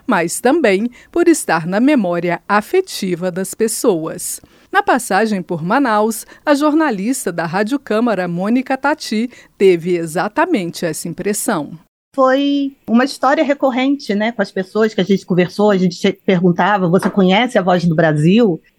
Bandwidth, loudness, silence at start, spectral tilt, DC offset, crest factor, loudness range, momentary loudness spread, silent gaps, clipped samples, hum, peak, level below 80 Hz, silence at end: 16.5 kHz; -16 LUFS; 0.1 s; -5.5 dB/octave; under 0.1%; 14 dB; 3 LU; 8 LU; 11.88-12.12 s; under 0.1%; none; 0 dBFS; -56 dBFS; 0.2 s